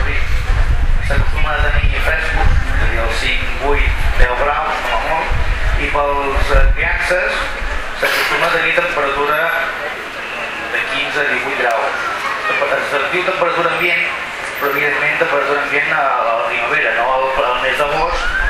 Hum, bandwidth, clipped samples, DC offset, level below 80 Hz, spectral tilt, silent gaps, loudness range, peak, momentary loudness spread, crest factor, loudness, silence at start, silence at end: none; 15.5 kHz; under 0.1%; under 0.1%; -20 dBFS; -4.5 dB/octave; none; 2 LU; 0 dBFS; 5 LU; 14 dB; -16 LUFS; 0 s; 0 s